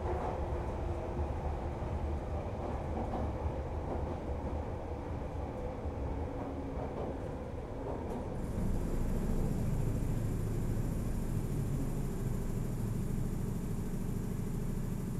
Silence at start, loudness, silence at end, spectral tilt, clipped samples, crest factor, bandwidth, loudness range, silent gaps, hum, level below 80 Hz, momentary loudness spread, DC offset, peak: 0 s; -38 LUFS; 0 s; -8 dB/octave; under 0.1%; 14 dB; 14 kHz; 4 LU; none; none; -40 dBFS; 4 LU; under 0.1%; -22 dBFS